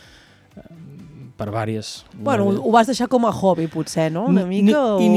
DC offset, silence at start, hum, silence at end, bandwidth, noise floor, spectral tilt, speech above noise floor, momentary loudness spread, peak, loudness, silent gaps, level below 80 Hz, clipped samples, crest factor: under 0.1%; 0.55 s; none; 0 s; 13.5 kHz; -49 dBFS; -6.5 dB/octave; 31 dB; 12 LU; 0 dBFS; -19 LUFS; none; -56 dBFS; under 0.1%; 18 dB